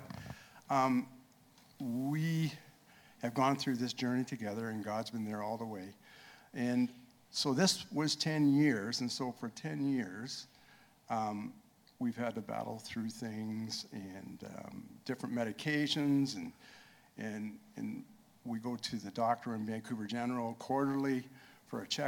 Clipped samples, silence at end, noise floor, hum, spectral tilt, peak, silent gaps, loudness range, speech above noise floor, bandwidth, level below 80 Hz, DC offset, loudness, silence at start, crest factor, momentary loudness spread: under 0.1%; 0 s; -64 dBFS; none; -5 dB/octave; -16 dBFS; none; 8 LU; 28 dB; 18.5 kHz; -76 dBFS; under 0.1%; -36 LUFS; 0 s; 20 dB; 17 LU